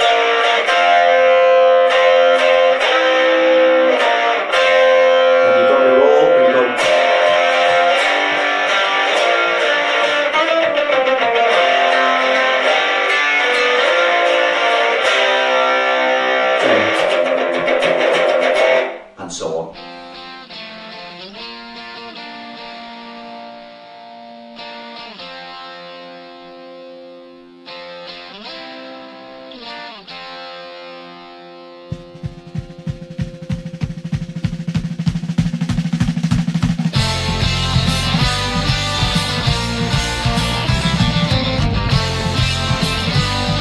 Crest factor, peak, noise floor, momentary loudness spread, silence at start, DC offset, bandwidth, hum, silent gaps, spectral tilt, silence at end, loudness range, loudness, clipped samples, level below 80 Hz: 16 dB; 0 dBFS; -40 dBFS; 20 LU; 0 s; under 0.1%; 12.5 kHz; none; none; -4.5 dB/octave; 0 s; 21 LU; -14 LUFS; under 0.1%; -34 dBFS